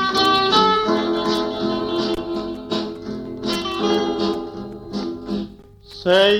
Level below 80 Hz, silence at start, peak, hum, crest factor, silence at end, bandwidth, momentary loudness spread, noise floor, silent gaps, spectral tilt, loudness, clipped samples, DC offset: -48 dBFS; 0 s; -4 dBFS; none; 18 dB; 0 s; 16 kHz; 15 LU; -42 dBFS; none; -4.5 dB/octave; -21 LUFS; under 0.1%; under 0.1%